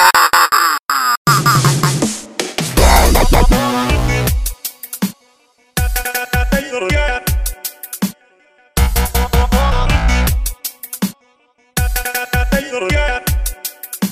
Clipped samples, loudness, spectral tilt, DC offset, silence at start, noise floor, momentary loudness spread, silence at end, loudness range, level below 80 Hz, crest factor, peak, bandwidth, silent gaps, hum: under 0.1%; -15 LUFS; -4 dB/octave; under 0.1%; 0 s; -55 dBFS; 12 LU; 0 s; 6 LU; -18 dBFS; 14 dB; 0 dBFS; 16.5 kHz; 1.17-1.25 s; none